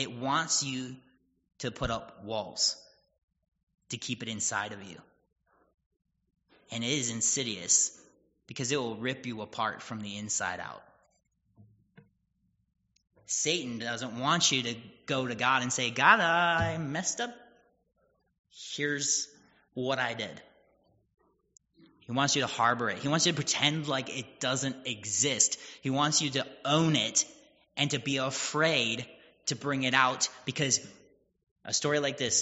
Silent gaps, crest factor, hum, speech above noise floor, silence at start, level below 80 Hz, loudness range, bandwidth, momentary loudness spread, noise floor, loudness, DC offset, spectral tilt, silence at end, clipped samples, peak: 3.23-3.28 s, 3.63-3.67 s, 5.86-5.91 s, 18.39-18.44 s, 31.51-31.56 s; 26 dB; none; 44 dB; 0 s; -62 dBFS; 9 LU; 8 kHz; 14 LU; -75 dBFS; -29 LUFS; under 0.1%; -2.5 dB/octave; 0 s; under 0.1%; -6 dBFS